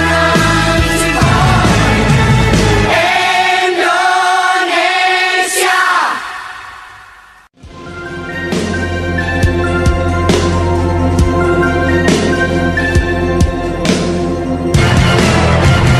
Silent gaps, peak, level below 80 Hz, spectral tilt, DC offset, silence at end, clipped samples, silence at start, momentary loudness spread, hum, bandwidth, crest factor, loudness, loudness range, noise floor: none; 0 dBFS; -22 dBFS; -5 dB/octave; under 0.1%; 0 s; under 0.1%; 0 s; 7 LU; none; 13.5 kHz; 12 dB; -11 LUFS; 7 LU; -41 dBFS